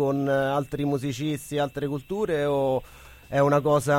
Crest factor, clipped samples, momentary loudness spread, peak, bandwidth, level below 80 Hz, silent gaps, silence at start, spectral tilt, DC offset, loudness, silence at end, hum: 16 dB; under 0.1%; 8 LU; -8 dBFS; 16.5 kHz; -52 dBFS; none; 0 s; -6.5 dB/octave; under 0.1%; -26 LUFS; 0 s; none